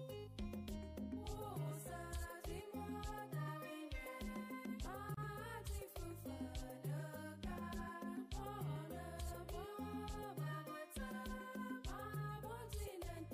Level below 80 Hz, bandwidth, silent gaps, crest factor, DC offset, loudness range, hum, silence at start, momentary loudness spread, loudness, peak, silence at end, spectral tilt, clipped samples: -54 dBFS; 15.5 kHz; none; 12 dB; under 0.1%; 1 LU; none; 0 s; 3 LU; -49 LUFS; -36 dBFS; 0 s; -5.5 dB/octave; under 0.1%